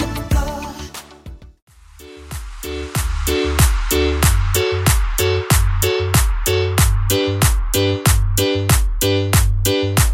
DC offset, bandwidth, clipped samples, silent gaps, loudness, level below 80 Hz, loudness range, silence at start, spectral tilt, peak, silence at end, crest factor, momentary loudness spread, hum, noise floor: under 0.1%; 17 kHz; under 0.1%; 1.62-1.67 s; -17 LUFS; -20 dBFS; 6 LU; 0 s; -4.5 dB/octave; 0 dBFS; 0 s; 16 dB; 13 LU; none; -41 dBFS